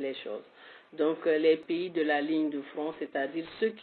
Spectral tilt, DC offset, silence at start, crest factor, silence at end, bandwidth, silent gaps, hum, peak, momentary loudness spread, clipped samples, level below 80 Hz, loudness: -3 dB/octave; under 0.1%; 0 s; 18 dB; 0 s; 4.6 kHz; none; none; -14 dBFS; 12 LU; under 0.1%; -78 dBFS; -30 LUFS